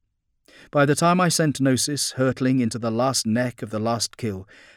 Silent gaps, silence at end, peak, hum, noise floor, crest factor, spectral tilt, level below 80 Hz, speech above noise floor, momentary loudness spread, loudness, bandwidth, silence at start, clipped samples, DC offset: none; 0.35 s; -6 dBFS; none; -63 dBFS; 16 dB; -4.5 dB/octave; -62 dBFS; 41 dB; 9 LU; -22 LUFS; 17 kHz; 0.75 s; under 0.1%; under 0.1%